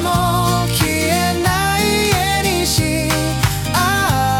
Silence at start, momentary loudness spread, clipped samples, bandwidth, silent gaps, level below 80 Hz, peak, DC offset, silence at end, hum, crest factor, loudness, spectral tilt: 0 s; 2 LU; under 0.1%; 18 kHz; none; -32 dBFS; -2 dBFS; under 0.1%; 0 s; none; 14 dB; -16 LUFS; -4 dB/octave